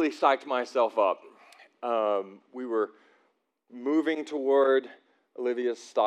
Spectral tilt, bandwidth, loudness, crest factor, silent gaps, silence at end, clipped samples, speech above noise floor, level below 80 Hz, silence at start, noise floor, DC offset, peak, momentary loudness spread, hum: -4 dB/octave; 9.8 kHz; -28 LUFS; 20 dB; none; 0 s; under 0.1%; 45 dB; under -90 dBFS; 0 s; -72 dBFS; under 0.1%; -8 dBFS; 12 LU; none